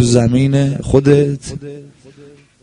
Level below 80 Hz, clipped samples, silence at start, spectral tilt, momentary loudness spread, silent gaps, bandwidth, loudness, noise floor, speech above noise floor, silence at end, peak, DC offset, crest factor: -36 dBFS; under 0.1%; 0 s; -7 dB/octave; 18 LU; none; 10.5 kHz; -13 LUFS; -43 dBFS; 29 dB; 0.8 s; 0 dBFS; under 0.1%; 14 dB